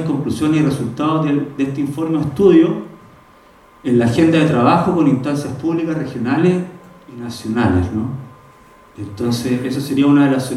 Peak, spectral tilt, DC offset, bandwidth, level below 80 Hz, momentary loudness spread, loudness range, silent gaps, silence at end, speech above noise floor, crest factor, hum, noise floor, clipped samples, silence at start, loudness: 0 dBFS; -7 dB/octave; under 0.1%; 13.5 kHz; -50 dBFS; 14 LU; 5 LU; none; 0 s; 31 dB; 16 dB; none; -46 dBFS; under 0.1%; 0 s; -16 LUFS